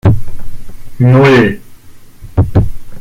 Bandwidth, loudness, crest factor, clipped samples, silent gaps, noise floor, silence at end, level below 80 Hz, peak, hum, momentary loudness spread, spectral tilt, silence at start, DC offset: 14 kHz; -11 LUFS; 10 dB; under 0.1%; none; -32 dBFS; 0 s; -24 dBFS; 0 dBFS; none; 17 LU; -8 dB/octave; 0.05 s; under 0.1%